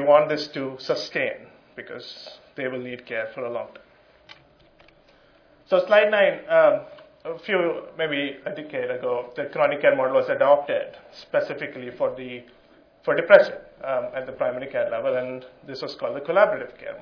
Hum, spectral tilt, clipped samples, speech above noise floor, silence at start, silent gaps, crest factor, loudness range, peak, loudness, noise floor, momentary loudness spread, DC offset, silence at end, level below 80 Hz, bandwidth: none; -5.5 dB/octave; under 0.1%; 33 dB; 0 s; none; 24 dB; 12 LU; 0 dBFS; -23 LUFS; -56 dBFS; 19 LU; under 0.1%; 0 s; -68 dBFS; 5.4 kHz